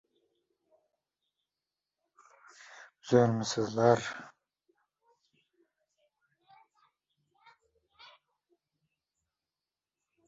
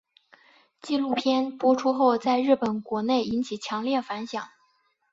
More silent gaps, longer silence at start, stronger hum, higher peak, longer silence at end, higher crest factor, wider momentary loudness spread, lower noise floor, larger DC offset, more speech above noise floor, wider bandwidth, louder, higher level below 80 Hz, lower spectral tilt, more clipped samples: neither; first, 2.8 s vs 0.85 s; neither; about the same, -10 dBFS vs -8 dBFS; first, 6 s vs 0.65 s; first, 26 dB vs 18 dB; first, 26 LU vs 11 LU; first, under -90 dBFS vs -68 dBFS; neither; first, over 63 dB vs 44 dB; about the same, 7.6 kHz vs 7.8 kHz; second, -28 LUFS vs -25 LUFS; second, -74 dBFS vs -68 dBFS; about the same, -5.5 dB/octave vs -5 dB/octave; neither